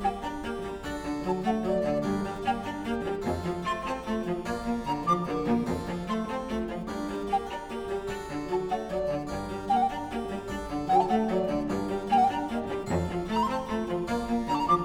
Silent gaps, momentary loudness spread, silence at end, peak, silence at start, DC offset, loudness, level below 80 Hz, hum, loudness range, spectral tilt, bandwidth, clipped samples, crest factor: none; 8 LU; 0 s; -12 dBFS; 0 s; under 0.1%; -30 LUFS; -48 dBFS; none; 4 LU; -6.5 dB/octave; 16.5 kHz; under 0.1%; 18 dB